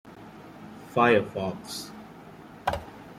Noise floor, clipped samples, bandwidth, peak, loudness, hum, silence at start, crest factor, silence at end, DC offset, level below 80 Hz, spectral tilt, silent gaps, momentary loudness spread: -47 dBFS; under 0.1%; 16 kHz; -8 dBFS; -27 LUFS; none; 0.05 s; 22 dB; 0 s; under 0.1%; -56 dBFS; -5 dB/octave; none; 25 LU